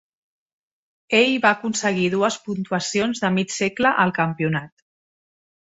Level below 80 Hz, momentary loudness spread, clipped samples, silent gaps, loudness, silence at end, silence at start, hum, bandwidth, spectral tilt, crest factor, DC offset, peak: -62 dBFS; 7 LU; under 0.1%; none; -21 LUFS; 1.1 s; 1.1 s; none; 8 kHz; -4.5 dB/octave; 20 dB; under 0.1%; -2 dBFS